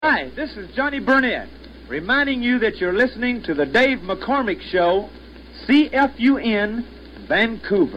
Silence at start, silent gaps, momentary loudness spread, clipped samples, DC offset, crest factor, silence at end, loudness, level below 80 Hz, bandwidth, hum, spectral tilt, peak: 0 s; none; 13 LU; under 0.1%; under 0.1%; 16 dB; 0 s; -20 LUFS; -44 dBFS; 8 kHz; none; -6 dB/octave; -4 dBFS